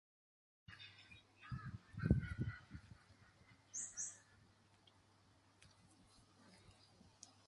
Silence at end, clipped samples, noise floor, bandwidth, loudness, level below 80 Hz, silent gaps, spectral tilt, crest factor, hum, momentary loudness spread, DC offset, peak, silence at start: 0.15 s; under 0.1%; -72 dBFS; 11.5 kHz; -46 LUFS; -58 dBFS; none; -5 dB/octave; 30 dB; none; 29 LU; under 0.1%; -20 dBFS; 0.7 s